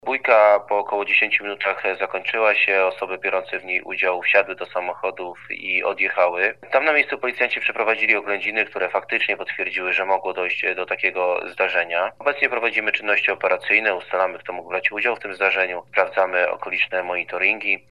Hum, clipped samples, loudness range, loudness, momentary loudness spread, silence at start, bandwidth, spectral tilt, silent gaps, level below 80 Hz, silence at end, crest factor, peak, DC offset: none; under 0.1%; 2 LU; -20 LUFS; 7 LU; 0.05 s; 10.5 kHz; -4 dB/octave; none; -72 dBFS; 0.1 s; 22 dB; 0 dBFS; 0.2%